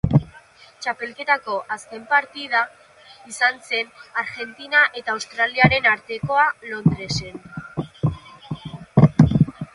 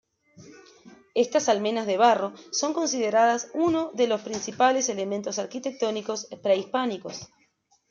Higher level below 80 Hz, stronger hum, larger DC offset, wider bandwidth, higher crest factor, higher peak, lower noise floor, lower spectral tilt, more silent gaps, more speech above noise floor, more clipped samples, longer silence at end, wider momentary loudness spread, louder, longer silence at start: first, -42 dBFS vs -72 dBFS; neither; neither; first, 11.5 kHz vs 7.6 kHz; about the same, 22 dB vs 20 dB; first, 0 dBFS vs -6 dBFS; second, -48 dBFS vs -67 dBFS; first, -6 dB/octave vs -3 dB/octave; neither; second, 26 dB vs 42 dB; neither; second, 0.1 s vs 0.65 s; first, 16 LU vs 10 LU; first, -20 LUFS vs -25 LUFS; second, 0.05 s vs 0.4 s